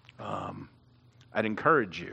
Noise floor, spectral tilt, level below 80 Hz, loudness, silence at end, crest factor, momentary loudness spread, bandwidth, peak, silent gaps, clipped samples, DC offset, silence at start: -60 dBFS; -6.5 dB/octave; -68 dBFS; -29 LUFS; 0 s; 22 dB; 15 LU; 8.6 kHz; -10 dBFS; none; under 0.1%; under 0.1%; 0.2 s